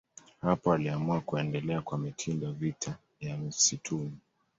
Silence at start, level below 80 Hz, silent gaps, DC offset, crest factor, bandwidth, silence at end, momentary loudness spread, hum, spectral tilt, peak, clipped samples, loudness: 0.45 s; -62 dBFS; none; under 0.1%; 20 dB; 8 kHz; 0.4 s; 12 LU; none; -4.5 dB/octave; -12 dBFS; under 0.1%; -32 LUFS